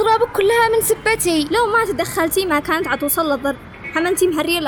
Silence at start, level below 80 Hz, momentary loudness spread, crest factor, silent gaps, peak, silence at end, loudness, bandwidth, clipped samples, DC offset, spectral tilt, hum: 0 s; -44 dBFS; 6 LU; 12 dB; none; -6 dBFS; 0 s; -17 LUFS; over 20 kHz; under 0.1%; under 0.1%; -3 dB/octave; none